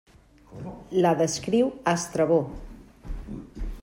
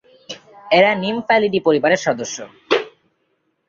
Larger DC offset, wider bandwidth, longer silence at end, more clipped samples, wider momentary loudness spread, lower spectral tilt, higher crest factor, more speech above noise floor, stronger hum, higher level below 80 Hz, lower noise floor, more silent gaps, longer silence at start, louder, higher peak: neither; first, 16 kHz vs 7.6 kHz; second, 0 s vs 0.8 s; neither; about the same, 19 LU vs 21 LU; first, -5.5 dB/octave vs -4 dB/octave; about the same, 18 dB vs 18 dB; second, 26 dB vs 51 dB; neither; first, -42 dBFS vs -62 dBFS; second, -50 dBFS vs -68 dBFS; neither; first, 0.5 s vs 0.3 s; second, -24 LUFS vs -17 LUFS; second, -8 dBFS vs -2 dBFS